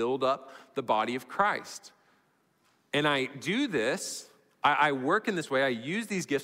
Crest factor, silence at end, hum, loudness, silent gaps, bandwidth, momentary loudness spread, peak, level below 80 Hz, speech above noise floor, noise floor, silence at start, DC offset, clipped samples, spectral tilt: 20 dB; 0 s; none; -29 LUFS; none; 16 kHz; 11 LU; -10 dBFS; -74 dBFS; 40 dB; -70 dBFS; 0 s; under 0.1%; under 0.1%; -4 dB/octave